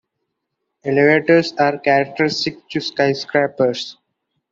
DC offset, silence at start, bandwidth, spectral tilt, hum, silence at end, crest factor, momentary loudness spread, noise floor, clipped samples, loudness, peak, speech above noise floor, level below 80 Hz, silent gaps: under 0.1%; 0.85 s; 7.8 kHz; -5.5 dB/octave; none; 0.6 s; 16 dB; 10 LU; -76 dBFS; under 0.1%; -17 LUFS; -2 dBFS; 59 dB; -62 dBFS; none